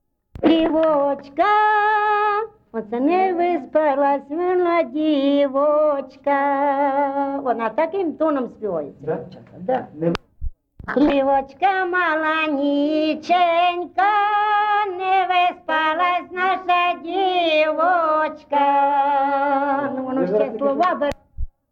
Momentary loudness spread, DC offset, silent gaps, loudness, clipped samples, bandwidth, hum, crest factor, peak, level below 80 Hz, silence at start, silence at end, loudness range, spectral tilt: 9 LU; under 0.1%; none; -19 LUFS; under 0.1%; 7.2 kHz; none; 14 dB; -6 dBFS; -44 dBFS; 0.35 s; 0.25 s; 4 LU; -6.5 dB/octave